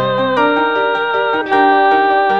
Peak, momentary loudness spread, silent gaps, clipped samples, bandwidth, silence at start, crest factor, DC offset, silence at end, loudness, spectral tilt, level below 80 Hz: 0 dBFS; 5 LU; none; under 0.1%; 6.6 kHz; 0 s; 12 dB; 0.5%; 0 s; -13 LUFS; -6 dB/octave; -56 dBFS